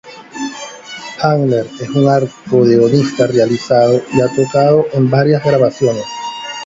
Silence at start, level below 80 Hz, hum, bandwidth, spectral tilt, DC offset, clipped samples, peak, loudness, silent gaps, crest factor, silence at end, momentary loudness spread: 0.05 s; -52 dBFS; none; 7.8 kHz; -6.5 dB/octave; under 0.1%; under 0.1%; 0 dBFS; -13 LUFS; none; 12 dB; 0 s; 14 LU